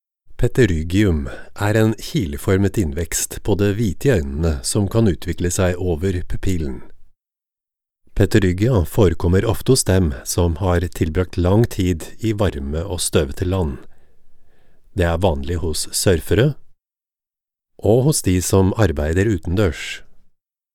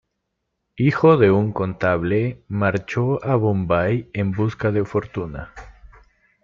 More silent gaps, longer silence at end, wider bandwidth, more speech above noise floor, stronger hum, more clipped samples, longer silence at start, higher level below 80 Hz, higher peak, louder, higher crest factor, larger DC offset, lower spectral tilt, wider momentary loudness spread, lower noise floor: neither; second, 0.55 s vs 0.7 s; first, 17 kHz vs 7.2 kHz; first, over 72 dB vs 57 dB; neither; neither; second, 0.25 s vs 0.75 s; first, -32 dBFS vs -48 dBFS; about the same, 0 dBFS vs -2 dBFS; about the same, -19 LUFS vs -20 LUFS; about the same, 18 dB vs 18 dB; neither; second, -5.5 dB/octave vs -9 dB/octave; second, 8 LU vs 11 LU; first, under -90 dBFS vs -76 dBFS